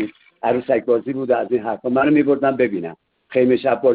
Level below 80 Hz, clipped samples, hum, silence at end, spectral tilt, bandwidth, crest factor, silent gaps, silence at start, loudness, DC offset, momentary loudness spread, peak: -60 dBFS; under 0.1%; none; 0 s; -11.5 dB/octave; 4.7 kHz; 14 dB; none; 0 s; -19 LUFS; under 0.1%; 9 LU; -4 dBFS